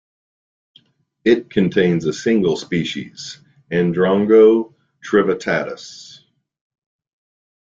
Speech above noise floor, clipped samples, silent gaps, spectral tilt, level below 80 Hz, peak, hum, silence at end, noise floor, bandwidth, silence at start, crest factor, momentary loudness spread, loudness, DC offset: 34 dB; under 0.1%; none; -6.5 dB/octave; -56 dBFS; -2 dBFS; none; 1.65 s; -50 dBFS; 7.6 kHz; 1.25 s; 18 dB; 21 LU; -17 LUFS; under 0.1%